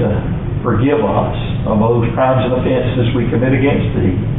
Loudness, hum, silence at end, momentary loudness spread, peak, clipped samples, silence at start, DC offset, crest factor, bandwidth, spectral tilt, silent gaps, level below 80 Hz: -15 LUFS; none; 0 s; 5 LU; -2 dBFS; under 0.1%; 0 s; under 0.1%; 10 dB; 4 kHz; -12.5 dB/octave; none; -28 dBFS